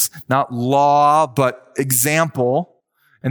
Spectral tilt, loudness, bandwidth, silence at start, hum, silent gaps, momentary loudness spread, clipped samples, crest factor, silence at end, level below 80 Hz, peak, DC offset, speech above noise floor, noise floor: -4.5 dB/octave; -17 LUFS; over 20 kHz; 0 s; none; none; 10 LU; under 0.1%; 14 dB; 0 s; -66 dBFS; -2 dBFS; under 0.1%; 43 dB; -60 dBFS